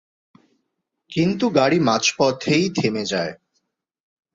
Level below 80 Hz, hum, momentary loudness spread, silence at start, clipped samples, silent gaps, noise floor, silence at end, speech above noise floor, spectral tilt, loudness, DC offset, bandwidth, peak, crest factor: -60 dBFS; none; 8 LU; 1.1 s; under 0.1%; none; -76 dBFS; 1 s; 57 dB; -4.5 dB/octave; -20 LUFS; under 0.1%; 7.8 kHz; -2 dBFS; 20 dB